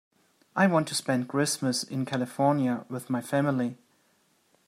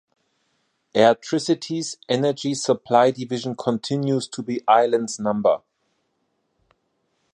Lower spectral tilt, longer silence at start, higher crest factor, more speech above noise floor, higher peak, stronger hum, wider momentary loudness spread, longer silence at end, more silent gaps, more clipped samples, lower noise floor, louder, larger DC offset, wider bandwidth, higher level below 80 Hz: about the same, -5 dB/octave vs -5 dB/octave; second, 0.55 s vs 0.95 s; about the same, 20 dB vs 20 dB; second, 41 dB vs 51 dB; second, -10 dBFS vs -2 dBFS; neither; about the same, 8 LU vs 10 LU; second, 0.95 s vs 1.75 s; neither; neither; about the same, -68 dBFS vs -71 dBFS; second, -28 LUFS vs -21 LUFS; neither; first, 16 kHz vs 11 kHz; second, -74 dBFS vs -68 dBFS